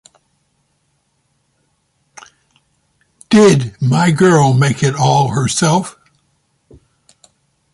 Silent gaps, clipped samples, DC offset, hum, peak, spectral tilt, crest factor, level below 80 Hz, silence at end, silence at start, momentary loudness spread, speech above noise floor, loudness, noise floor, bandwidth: none; under 0.1%; under 0.1%; none; 0 dBFS; -5.5 dB/octave; 16 dB; -50 dBFS; 1.85 s; 3.3 s; 6 LU; 51 dB; -12 LUFS; -64 dBFS; 11.5 kHz